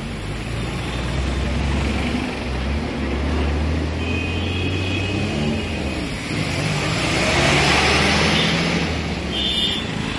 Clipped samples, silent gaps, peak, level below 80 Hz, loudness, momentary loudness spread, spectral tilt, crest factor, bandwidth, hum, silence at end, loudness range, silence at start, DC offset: under 0.1%; none; -4 dBFS; -30 dBFS; -20 LUFS; 10 LU; -4.5 dB/octave; 18 dB; 11.5 kHz; none; 0 s; 5 LU; 0 s; under 0.1%